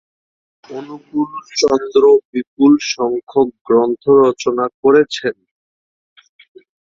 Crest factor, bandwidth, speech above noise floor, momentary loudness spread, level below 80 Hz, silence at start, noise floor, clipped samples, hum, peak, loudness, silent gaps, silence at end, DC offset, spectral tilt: 14 dB; 7.6 kHz; over 76 dB; 13 LU; -58 dBFS; 0.7 s; under -90 dBFS; under 0.1%; none; -2 dBFS; -15 LUFS; 2.25-2.33 s, 2.47-2.57 s, 3.23-3.27 s, 3.61-3.65 s, 4.74-4.83 s; 1.5 s; under 0.1%; -4.5 dB/octave